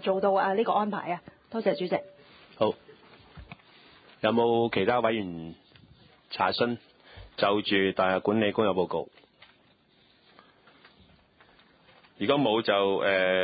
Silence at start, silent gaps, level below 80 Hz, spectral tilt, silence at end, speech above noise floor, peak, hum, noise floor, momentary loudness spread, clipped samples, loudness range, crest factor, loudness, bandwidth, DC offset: 0 s; none; -62 dBFS; -9.5 dB/octave; 0 s; 37 dB; -10 dBFS; none; -63 dBFS; 14 LU; under 0.1%; 6 LU; 20 dB; -27 LUFS; 5 kHz; under 0.1%